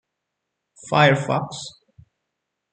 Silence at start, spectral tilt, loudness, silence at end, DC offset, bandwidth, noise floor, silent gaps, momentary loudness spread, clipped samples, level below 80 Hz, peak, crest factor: 0.85 s; -5.5 dB/octave; -19 LUFS; 1.05 s; under 0.1%; 9.2 kHz; -80 dBFS; none; 18 LU; under 0.1%; -64 dBFS; -2 dBFS; 22 dB